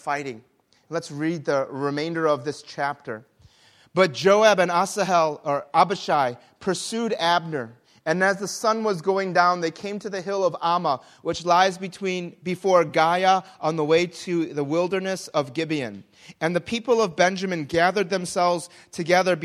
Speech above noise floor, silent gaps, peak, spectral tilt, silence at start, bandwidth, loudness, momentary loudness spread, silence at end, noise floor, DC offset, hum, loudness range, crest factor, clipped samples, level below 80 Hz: 32 dB; none; -2 dBFS; -4.5 dB/octave; 0.05 s; 14.5 kHz; -23 LUFS; 12 LU; 0 s; -55 dBFS; under 0.1%; none; 4 LU; 20 dB; under 0.1%; -66 dBFS